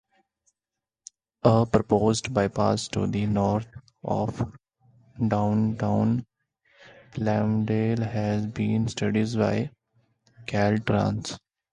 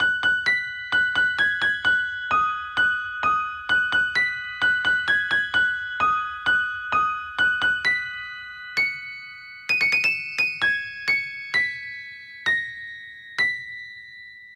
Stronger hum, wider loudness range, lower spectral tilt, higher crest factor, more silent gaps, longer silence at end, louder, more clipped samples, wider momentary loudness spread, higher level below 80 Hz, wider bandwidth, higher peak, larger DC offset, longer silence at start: neither; about the same, 3 LU vs 3 LU; first, -7 dB/octave vs -1.5 dB/octave; first, 22 dB vs 16 dB; neither; first, 0.35 s vs 0 s; second, -25 LUFS vs -22 LUFS; neither; second, 11 LU vs 15 LU; first, -52 dBFS vs -58 dBFS; second, 10 kHz vs 14 kHz; first, -4 dBFS vs -8 dBFS; neither; first, 1.45 s vs 0 s